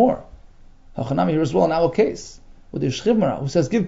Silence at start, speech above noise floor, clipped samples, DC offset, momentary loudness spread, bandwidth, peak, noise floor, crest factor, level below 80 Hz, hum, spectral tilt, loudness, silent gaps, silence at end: 0 s; 25 dB; under 0.1%; under 0.1%; 16 LU; 7.8 kHz; -4 dBFS; -45 dBFS; 16 dB; -44 dBFS; none; -7 dB/octave; -21 LUFS; none; 0 s